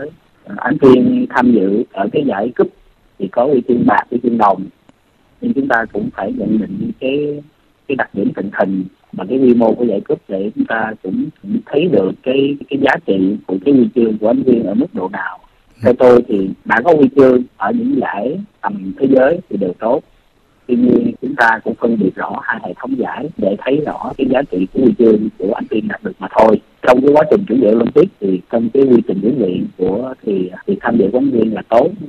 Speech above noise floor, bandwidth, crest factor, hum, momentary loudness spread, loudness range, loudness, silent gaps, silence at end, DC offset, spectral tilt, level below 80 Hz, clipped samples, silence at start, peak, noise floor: 39 dB; 7 kHz; 14 dB; none; 11 LU; 5 LU; -14 LUFS; none; 0 s; under 0.1%; -8.5 dB/octave; -50 dBFS; under 0.1%; 0 s; 0 dBFS; -53 dBFS